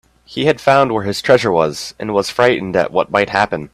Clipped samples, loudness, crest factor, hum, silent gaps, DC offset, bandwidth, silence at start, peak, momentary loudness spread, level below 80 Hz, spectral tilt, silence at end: under 0.1%; -15 LUFS; 16 dB; none; none; under 0.1%; 14 kHz; 0.3 s; 0 dBFS; 7 LU; -50 dBFS; -5 dB/octave; 0.05 s